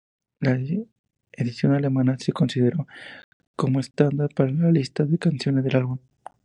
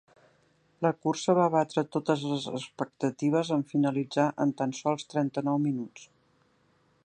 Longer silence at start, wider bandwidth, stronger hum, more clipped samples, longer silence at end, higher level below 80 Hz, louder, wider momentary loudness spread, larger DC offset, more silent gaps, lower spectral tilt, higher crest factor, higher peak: second, 0.4 s vs 0.8 s; about the same, 10 kHz vs 9.2 kHz; neither; neither; second, 0.5 s vs 1 s; first, -64 dBFS vs -78 dBFS; first, -23 LUFS vs -29 LUFS; first, 12 LU vs 7 LU; neither; first, 0.92-1.04 s, 3.24-3.40 s, 3.47-3.54 s vs none; first, -8 dB/octave vs -6 dB/octave; about the same, 18 dB vs 20 dB; first, -4 dBFS vs -10 dBFS